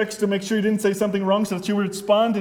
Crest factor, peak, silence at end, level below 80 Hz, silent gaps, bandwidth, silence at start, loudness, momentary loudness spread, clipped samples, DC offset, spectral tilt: 14 dB; -6 dBFS; 0 s; -62 dBFS; none; 17 kHz; 0 s; -22 LUFS; 4 LU; under 0.1%; under 0.1%; -5.5 dB/octave